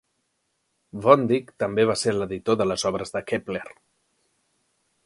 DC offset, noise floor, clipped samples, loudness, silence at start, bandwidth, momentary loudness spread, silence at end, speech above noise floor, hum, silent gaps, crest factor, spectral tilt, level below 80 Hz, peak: under 0.1%; -74 dBFS; under 0.1%; -23 LUFS; 0.95 s; 11.5 kHz; 15 LU; 1.35 s; 51 dB; none; none; 24 dB; -5 dB/octave; -58 dBFS; -2 dBFS